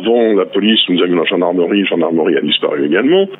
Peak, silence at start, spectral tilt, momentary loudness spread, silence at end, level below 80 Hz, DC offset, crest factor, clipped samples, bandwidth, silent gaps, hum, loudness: 0 dBFS; 0 s; -8.5 dB/octave; 3 LU; 0.05 s; -66 dBFS; under 0.1%; 12 dB; under 0.1%; 4.1 kHz; none; none; -13 LUFS